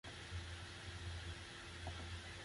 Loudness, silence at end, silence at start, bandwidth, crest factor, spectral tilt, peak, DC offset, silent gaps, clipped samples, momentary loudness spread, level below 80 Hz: -50 LUFS; 0 s; 0.05 s; 11.5 kHz; 14 dB; -4 dB/octave; -36 dBFS; under 0.1%; none; under 0.1%; 2 LU; -56 dBFS